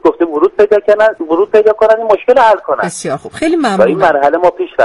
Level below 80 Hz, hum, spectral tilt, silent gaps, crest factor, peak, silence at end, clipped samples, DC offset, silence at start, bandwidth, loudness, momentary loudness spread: -48 dBFS; none; -5 dB/octave; none; 10 dB; 0 dBFS; 0 s; 0.2%; under 0.1%; 0.05 s; 11.5 kHz; -11 LUFS; 7 LU